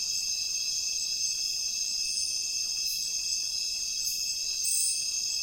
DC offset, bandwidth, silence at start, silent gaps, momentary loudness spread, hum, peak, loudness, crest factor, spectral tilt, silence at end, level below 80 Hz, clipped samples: under 0.1%; 17 kHz; 0 s; none; 3 LU; none; -14 dBFS; -28 LUFS; 16 dB; 3.5 dB/octave; 0 s; -62 dBFS; under 0.1%